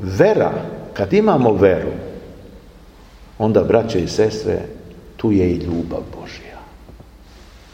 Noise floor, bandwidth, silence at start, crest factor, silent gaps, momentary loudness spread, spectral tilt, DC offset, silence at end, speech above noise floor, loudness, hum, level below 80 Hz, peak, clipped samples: -43 dBFS; 15 kHz; 0 s; 18 dB; none; 21 LU; -7 dB/octave; under 0.1%; 0.15 s; 26 dB; -17 LUFS; none; -42 dBFS; 0 dBFS; under 0.1%